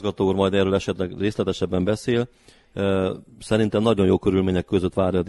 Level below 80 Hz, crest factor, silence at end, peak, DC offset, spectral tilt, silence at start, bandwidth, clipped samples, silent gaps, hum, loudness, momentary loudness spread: -46 dBFS; 16 dB; 0 s; -6 dBFS; under 0.1%; -7 dB/octave; 0 s; 11.5 kHz; under 0.1%; none; none; -22 LUFS; 8 LU